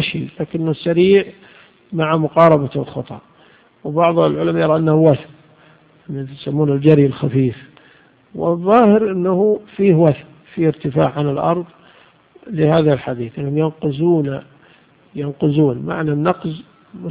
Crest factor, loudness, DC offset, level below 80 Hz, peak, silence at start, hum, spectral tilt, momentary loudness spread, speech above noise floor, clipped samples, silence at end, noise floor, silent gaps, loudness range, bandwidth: 16 dB; -16 LUFS; under 0.1%; -52 dBFS; 0 dBFS; 0 s; none; -10.5 dB/octave; 16 LU; 35 dB; under 0.1%; 0 s; -50 dBFS; none; 4 LU; 4.9 kHz